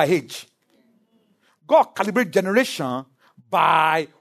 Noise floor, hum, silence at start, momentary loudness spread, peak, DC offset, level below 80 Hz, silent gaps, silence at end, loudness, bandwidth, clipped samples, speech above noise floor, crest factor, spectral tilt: -62 dBFS; none; 0 s; 13 LU; -2 dBFS; under 0.1%; -74 dBFS; none; 0.15 s; -20 LUFS; 13.5 kHz; under 0.1%; 43 dB; 18 dB; -4.5 dB/octave